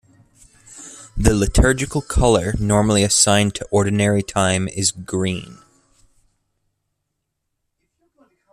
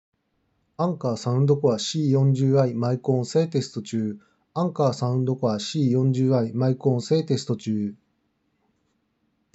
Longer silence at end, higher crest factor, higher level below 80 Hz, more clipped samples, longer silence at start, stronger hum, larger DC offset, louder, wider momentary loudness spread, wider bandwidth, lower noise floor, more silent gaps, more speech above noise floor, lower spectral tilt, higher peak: first, 3 s vs 1.6 s; about the same, 18 dB vs 16 dB; first, -30 dBFS vs -76 dBFS; neither; about the same, 0.75 s vs 0.8 s; neither; neither; first, -18 LUFS vs -23 LUFS; first, 12 LU vs 8 LU; first, 14.5 kHz vs 8 kHz; first, -76 dBFS vs -71 dBFS; neither; first, 59 dB vs 49 dB; second, -4 dB/octave vs -7 dB/octave; first, -2 dBFS vs -8 dBFS